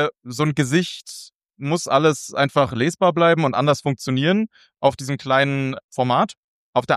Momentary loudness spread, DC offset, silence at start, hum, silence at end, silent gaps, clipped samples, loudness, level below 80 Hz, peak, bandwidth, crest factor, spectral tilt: 10 LU; under 0.1%; 0 s; none; 0 s; 1.34-1.40 s, 5.84-5.89 s, 6.37-6.73 s; under 0.1%; -20 LUFS; -60 dBFS; -2 dBFS; 14 kHz; 18 dB; -5.5 dB/octave